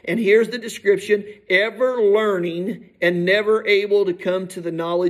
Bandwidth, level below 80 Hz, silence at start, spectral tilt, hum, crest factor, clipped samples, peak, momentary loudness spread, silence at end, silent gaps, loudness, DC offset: 13.5 kHz; -70 dBFS; 0.05 s; -5.5 dB/octave; none; 14 dB; under 0.1%; -4 dBFS; 8 LU; 0 s; none; -19 LUFS; under 0.1%